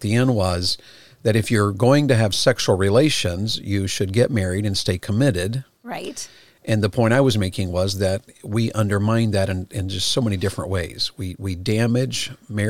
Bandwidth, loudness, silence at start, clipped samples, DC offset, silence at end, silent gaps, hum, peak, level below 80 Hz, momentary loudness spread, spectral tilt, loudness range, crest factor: 16 kHz; -21 LUFS; 0 s; under 0.1%; 0.6%; 0 s; none; none; -4 dBFS; -52 dBFS; 11 LU; -5.5 dB/octave; 4 LU; 16 dB